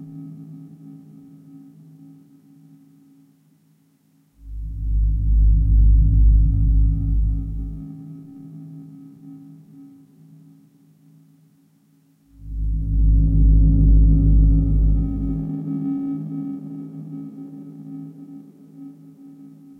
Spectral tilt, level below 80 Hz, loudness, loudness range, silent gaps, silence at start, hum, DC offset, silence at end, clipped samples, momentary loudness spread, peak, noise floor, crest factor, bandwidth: -12.5 dB/octave; -22 dBFS; -20 LUFS; 19 LU; none; 0 s; none; under 0.1%; 0.35 s; under 0.1%; 25 LU; -6 dBFS; -60 dBFS; 14 dB; 1.3 kHz